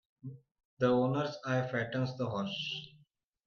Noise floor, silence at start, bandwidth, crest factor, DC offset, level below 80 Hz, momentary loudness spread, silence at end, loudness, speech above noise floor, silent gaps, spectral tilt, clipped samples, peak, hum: -69 dBFS; 0.25 s; 7 kHz; 18 dB; under 0.1%; -72 dBFS; 20 LU; 0.55 s; -34 LUFS; 36 dB; 0.65-0.77 s; -6.5 dB/octave; under 0.1%; -18 dBFS; none